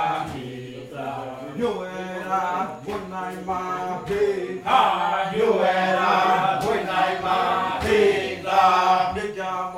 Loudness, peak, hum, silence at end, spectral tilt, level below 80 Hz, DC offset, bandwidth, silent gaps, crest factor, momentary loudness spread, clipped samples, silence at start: -22 LUFS; -4 dBFS; none; 0 s; -5 dB/octave; -52 dBFS; under 0.1%; 15.5 kHz; none; 18 dB; 13 LU; under 0.1%; 0 s